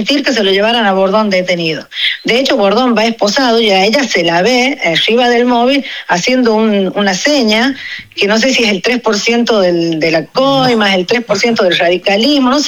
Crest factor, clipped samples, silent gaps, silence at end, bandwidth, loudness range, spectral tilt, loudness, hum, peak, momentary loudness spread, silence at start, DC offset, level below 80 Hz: 10 dB; under 0.1%; none; 0 s; 17 kHz; 1 LU; -3.5 dB/octave; -10 LUFS; none; -2 dBFS; 4 LU; 0 s; under 0.1%; -50 dBFS